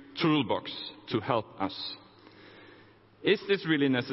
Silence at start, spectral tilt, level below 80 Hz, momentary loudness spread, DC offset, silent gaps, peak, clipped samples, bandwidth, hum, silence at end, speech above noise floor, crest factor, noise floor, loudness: 0 s; -9 dB/octave; -68 dBFS; 12 LU; under 0.1%; none; -12 dBFS; under 0.1%; 6 kHz; none; 0 s; 28 dB; 20 dB; -57 dBFS; -30 LUFS